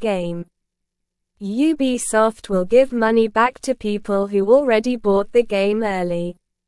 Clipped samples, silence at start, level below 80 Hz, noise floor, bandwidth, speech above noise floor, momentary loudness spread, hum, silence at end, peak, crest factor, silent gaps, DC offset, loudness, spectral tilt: under 0.1%; 0 s; -48 dBFS; -78 dBFS; 12 kHz; 60 dB; 10 LU; none; 0.35 s; -2 dBFS; 16 dB; none; 0.1%; -19 LUFS; -5 dB/octave